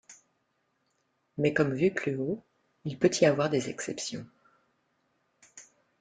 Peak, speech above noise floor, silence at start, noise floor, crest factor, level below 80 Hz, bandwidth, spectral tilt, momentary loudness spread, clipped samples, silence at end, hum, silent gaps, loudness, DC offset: -10 dBFS; 48 dB; 0.1 s; -76 dBFS; 22 dB; -68 dBFS; 9.4 kHz; -5 dB/octave; 16 LU; under 0.1%; 0.4 s; none; none; -29 LUFS; under 0.1%